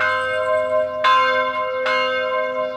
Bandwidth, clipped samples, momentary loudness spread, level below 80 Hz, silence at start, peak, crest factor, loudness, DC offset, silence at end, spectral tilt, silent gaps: 10 kHz; under 0.1%; 6 LU; -62 dBFS; 0 s; -4 dBFS; 14 dB; -19 LUFS; under 0.1%; 0 s; -3 dB/octave; none